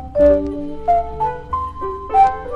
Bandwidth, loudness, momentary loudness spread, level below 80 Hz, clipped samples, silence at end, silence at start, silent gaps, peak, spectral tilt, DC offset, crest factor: 7.8 kHz; -18 LUFS; 11 LU; -34 dBFS; under 0.1%; 0 s; 0 s; none; -2 dBFS; -8 dB/octave; under 0.1%; 14 dB